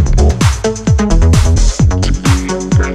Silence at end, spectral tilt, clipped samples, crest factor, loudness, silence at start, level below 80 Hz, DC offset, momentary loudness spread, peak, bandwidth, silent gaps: 0 s; -5.5 dB/octave; under 0.1%; 10 dB; -12 LUFS; 0 s; -14 dBFS; under 0.1%; 4 LU; 0 dBFS; 13 kHz; none